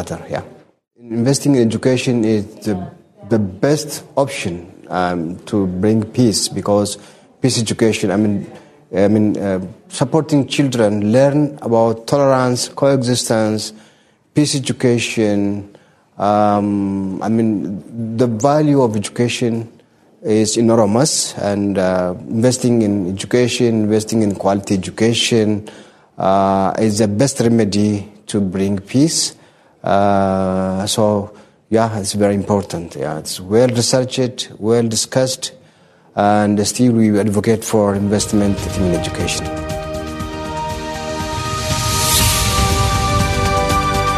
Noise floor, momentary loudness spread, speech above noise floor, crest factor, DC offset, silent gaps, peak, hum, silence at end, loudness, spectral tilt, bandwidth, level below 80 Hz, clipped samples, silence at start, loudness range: -51 dBFS; 10 LU; 36 dB; 16 dB; under 0.1%; none; 0 dBFS; none; 0 s; -16 LUFS; -5 dB/octave; 13.5 kHz; -36 dBFS; under 0.1%; 0 s; 3 LU